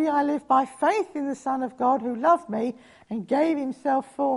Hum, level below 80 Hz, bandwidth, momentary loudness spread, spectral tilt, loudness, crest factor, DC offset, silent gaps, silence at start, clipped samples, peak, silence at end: none; -70 dBFS; 11.5 kHz; 8 LU; -6 dB/octave; -25 LUFS; 16 dB; under 0.1%; none; 0 s; under 0.1%; -8 dBFS; 0 s